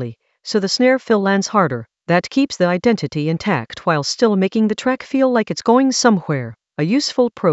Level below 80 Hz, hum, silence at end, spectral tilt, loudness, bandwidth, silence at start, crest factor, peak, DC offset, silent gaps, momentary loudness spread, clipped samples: -58 dBFS; none; 0 s; -5 dB/octave; -17 LUFS; 8.2 kHz; 0 s; 16 dB; 0 dBFS; under 0.1%; none; 7 LU; under 0.1%